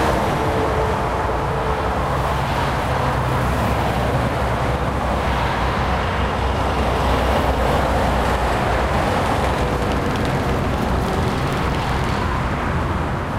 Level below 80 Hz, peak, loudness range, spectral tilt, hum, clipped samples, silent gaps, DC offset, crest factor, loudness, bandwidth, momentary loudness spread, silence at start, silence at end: -26 dBFS; -6 dBFS; 1 LU; -6 dB/octave; none; under 0.1%; none; under 0.1%; 14 dB; -20 LUFS; 16 kHz; 2 LU; 0 s; 0 s